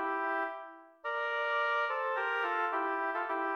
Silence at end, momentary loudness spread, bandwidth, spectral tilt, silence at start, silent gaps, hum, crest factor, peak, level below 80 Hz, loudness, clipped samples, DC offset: 0 s; 8 LU; 15 kHz; -2 dB/octave; 0 s; none; none; 12 dB; -20 dBFS; -88 dBFS; -33 LUFS; under 0.1%; under 0.1%